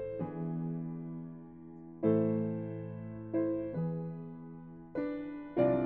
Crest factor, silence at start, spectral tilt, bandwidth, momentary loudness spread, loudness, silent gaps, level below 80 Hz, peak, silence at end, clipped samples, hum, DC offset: 20 dB; 0 s; -10 dB/octave; 4.3 kHz; 18 LU; -36 LUFS; none; -66 dBFS; -16 dBFS; 0 s; under 0.1%; none; under 0.1%